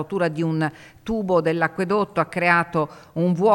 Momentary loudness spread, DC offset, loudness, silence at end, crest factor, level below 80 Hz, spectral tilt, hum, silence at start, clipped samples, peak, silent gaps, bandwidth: 9 LU; under 0.1%; -22 LUFS; 0 s; 18 dB; -52 dBFS; -7.5 dB/octave; none; 0 s; under 0.1%; -4 dBFS; none; 12 kHz